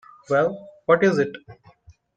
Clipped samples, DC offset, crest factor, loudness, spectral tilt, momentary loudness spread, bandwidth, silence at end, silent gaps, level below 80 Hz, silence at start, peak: under 0.1%; under 0.1%; 20 dB; -22 LUFS; -6.5 dB/octave; 12 LU; 9 kHz; 0.65 s; none; -62 dBFS; 0.3 s; -2 dBFS